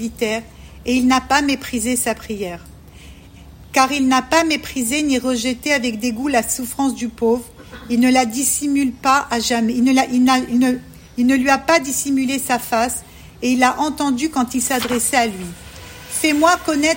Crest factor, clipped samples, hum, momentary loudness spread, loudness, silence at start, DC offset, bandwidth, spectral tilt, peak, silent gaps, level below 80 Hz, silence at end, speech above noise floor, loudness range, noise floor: 18 dB; under 0.1%; none; 11 LU; -18 LUFS; 0 s; under 0.1%; 16.5 kHz; -2.5 dB/octave; 0 dBFS; none; -44 dBFS; 0 s; 23 dB; 3 LU; -40 dBFS